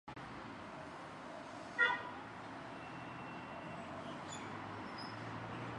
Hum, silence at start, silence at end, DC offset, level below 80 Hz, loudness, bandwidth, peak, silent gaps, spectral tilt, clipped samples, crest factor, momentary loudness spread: none; 0.05 s; 0 s; under 0.1%; -70 dBFS; -44 LUFS; 11 kHz; -18 dBFS; none; -4.5 dB/octave; under 0.1%; 26 dB; 15 LU